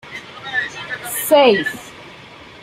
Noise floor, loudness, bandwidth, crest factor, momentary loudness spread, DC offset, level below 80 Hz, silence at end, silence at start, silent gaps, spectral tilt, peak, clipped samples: -40 dBFS; -17 LUFS; 16 kHz; 18 dB; 26 LU; under 0.1%; -58 dBFS; 0 s; 0.05 s; none; -3 dB/octave; -2 dBFS; under 0.1%